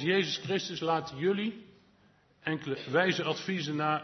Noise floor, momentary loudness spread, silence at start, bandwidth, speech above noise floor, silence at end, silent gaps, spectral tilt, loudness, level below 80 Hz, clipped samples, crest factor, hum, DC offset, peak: -65 dBFS; 8 LU; 0 s; 6.4 kHz; 34 dB; 0 s; none; -5 dB/octave; -31 LUFS; -74 dBFS; under 0.1%; 20 dB; none; under 0.1%; -12 dBFS